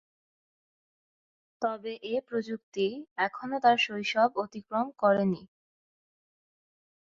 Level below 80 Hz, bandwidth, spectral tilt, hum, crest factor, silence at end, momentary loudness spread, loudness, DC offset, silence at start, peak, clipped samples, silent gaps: -76 dBFS; 7.6 kHz; -5.5 dB/octave; none; 22 dB; 1.55 s; 9 LU; -29 LUFS; under 0.1%; 1.6 s; -10 dBFS; under 0.1%; 2.63-2.72 s, 3.11-3.16 s